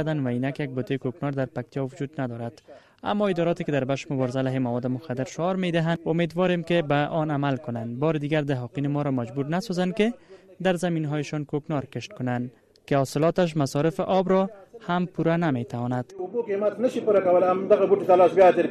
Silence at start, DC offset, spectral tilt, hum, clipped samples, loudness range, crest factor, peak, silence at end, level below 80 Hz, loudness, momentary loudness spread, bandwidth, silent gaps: 0 s; under 0.1%; -7 dB/octave; none; under 0.1%; 5 LU; 18 dB; -6 dBFS; 0 s; -62 dBFS; -25 LUFS; 11 LU; 13 kHz; none